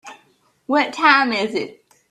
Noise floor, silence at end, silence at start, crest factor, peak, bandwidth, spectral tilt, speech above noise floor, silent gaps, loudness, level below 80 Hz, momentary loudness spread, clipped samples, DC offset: -59 dBFS; 0.4 s; 0.05 s; 20 dB; 0 dBFS; 12 kHz; -3.5 dB/octave; 41 dB; none; -17 LUFS; -70 dBFS; 13 LU; under 0.1%; under 0.1%